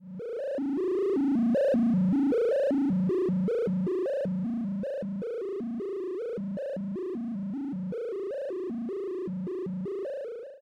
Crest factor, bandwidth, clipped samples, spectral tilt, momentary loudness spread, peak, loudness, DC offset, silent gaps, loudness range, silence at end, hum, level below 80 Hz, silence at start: 8 dB; 7 kHz; under 0.1%; -9.5 dB/octave; 9 LU; -20 dBFS; -30 LUFS; under 0.1%; none; 8 LU; 0.05 s; none; -66 dBFS; 0 s